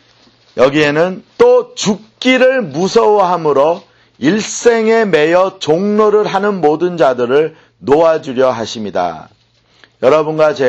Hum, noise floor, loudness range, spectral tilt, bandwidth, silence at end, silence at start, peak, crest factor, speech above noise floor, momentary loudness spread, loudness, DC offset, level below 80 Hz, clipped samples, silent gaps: none; -49 dBFS; 3 LU; -5 dB/octave; 8.4 kHz; 0 s; 0.55 s; 0 dBFS; 12 dB; 37 dB; 8 LU; -12 LUFS; under 0.1%; -52 dBFS; under 0.1%; none